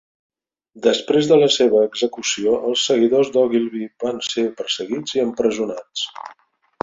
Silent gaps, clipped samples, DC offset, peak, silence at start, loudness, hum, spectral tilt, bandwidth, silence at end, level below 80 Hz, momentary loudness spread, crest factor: none; under 0.1%; under 0.1%; -2 dBFS; 0.75 s; -19 LUFS; none; -3.5 dB/octave; 7.8 kHz; 0.5 s; -62 dBFS; 12 LU; 18 dB